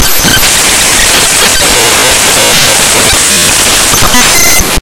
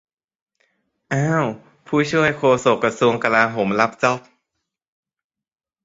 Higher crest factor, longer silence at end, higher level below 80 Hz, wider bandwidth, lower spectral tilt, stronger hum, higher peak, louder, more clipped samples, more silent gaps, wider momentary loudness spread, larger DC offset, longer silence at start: second, 6 dB vs 20 dB; second, 0 s vs 1.65 s; first, -22 dBFS vs -58 dBFS; first, over 20 kHz vs 8 kHz; second, -1 dB/octave vs -5.5 dB/octave; neither; about the same, 0 dBFS vs 0 dBFS; first, -3 LUFS vs -19 LUFS; first, 6% vs under 0.1%; neither; second, 1 LU vs 8 LU; neither; second, 0 s vs 1.1 s